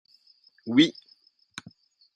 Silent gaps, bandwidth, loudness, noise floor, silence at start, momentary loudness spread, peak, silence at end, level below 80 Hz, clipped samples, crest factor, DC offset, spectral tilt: none; 9.8 kHz; -23 LUFS; -62 dBFS; 0.65 s; 22 LU; -6 dBFS; 1.25 s; -74 dBFS; under 0.1%; 24 dB; under 0.1%; -4.5 dB/octave